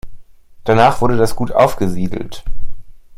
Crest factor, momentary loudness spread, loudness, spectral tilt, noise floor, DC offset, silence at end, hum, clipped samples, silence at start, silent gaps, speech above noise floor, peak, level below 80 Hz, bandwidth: 14 dB; 20 LU; -15 LUFS; -6 dB/octave; -36 dBFS; under 0.1%; 0.05 s; none; under 0.1%; 0.05 s; none; 23 dB; 0 dBFS; -28 dBFS; 15 kHz